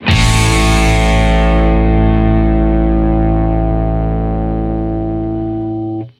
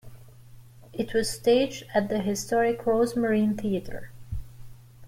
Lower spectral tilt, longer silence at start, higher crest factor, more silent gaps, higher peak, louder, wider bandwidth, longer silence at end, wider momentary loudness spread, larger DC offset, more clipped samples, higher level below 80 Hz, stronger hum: about the same, -6 dB/octave vs -5 dB/octave; about the same, 0 s vs 0.05 s; about the same, 12 dB vs 16 dB; neither; first, 0 dBFS vs -10 dBFS; first, -13 LUFS vs -26 LUFS; second, 13 kHz vs 16.5 kHz; about the same, 0.1 s vs 0 s; second, 7 LU vs 17 LU; neither; neither; first, -16 dBFS vs -48 dBFS; neither